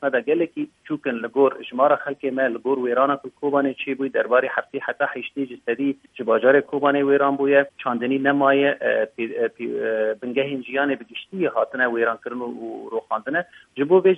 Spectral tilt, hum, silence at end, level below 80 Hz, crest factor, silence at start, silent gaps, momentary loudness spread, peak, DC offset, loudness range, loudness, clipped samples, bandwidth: -7.5 dB/octave; none; 0 s; -74 dBFS; 18 dB; 0 s; none; 11 LU; -4 dBFS; under 0.1%; 5 LU; -22 LUFS; under 0.1%; 3.8 kHz